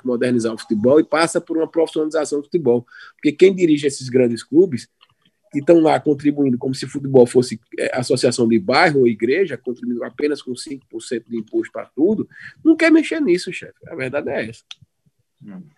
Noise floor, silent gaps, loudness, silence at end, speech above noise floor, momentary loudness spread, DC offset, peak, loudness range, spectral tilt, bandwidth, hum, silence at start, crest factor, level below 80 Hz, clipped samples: -66 dBFS; none; -18 LUFS; 0.15 s; 48 dB; 14 LU; under 0.1%; 0 dBFS; 3 LU; -5.5 dB/octave; 12 kHz; none; 0.05 s; 18 dB; -66 dBFS; under 0.1%